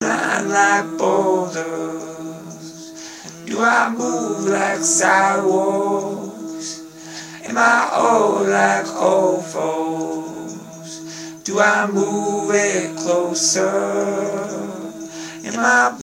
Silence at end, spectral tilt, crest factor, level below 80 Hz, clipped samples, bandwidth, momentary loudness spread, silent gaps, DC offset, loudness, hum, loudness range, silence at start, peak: 0 s; -3 dB/octave; 18 dB; -70 dBFS; under 0.1%; 16 kHz; 18 LU; none; under 0.1%; -18 LUFS; none; 4 LU; 0 s; 0 dBFS